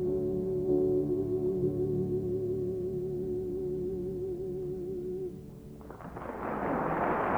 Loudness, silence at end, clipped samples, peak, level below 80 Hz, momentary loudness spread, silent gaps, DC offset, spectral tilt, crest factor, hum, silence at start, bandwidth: -33 LUFS; 0 s; under 0.1%; -16 dBFS; -52 dBFS; 12 LU; none; under 0.1%; -9.5 dB/octave; 16 dB; none; 0 s; 4.4 kHz